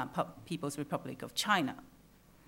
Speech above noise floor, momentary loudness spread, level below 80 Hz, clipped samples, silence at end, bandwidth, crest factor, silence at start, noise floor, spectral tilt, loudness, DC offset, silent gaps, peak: 25 dB; 9 LU; -68 dBFS; under 0.1%; 0.6 s; 16.5 kHz; 22 dB; 0 s; -61 dBFS; -4 dB/octave; -36 LUFS; under 0.1%; none; -14 dBFS